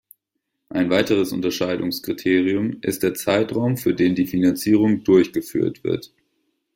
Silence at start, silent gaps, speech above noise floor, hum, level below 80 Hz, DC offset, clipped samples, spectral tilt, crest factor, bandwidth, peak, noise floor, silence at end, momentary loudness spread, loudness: 0.75 s; none; 58 dB; none; -58 dBFS; under 0.1%; under 0.1%; -6 dB/octave; 18 dB; 16.5 kHz; -2 dBFS; -78 dBFS; 0.7 s; 7 LU; -20 LUFS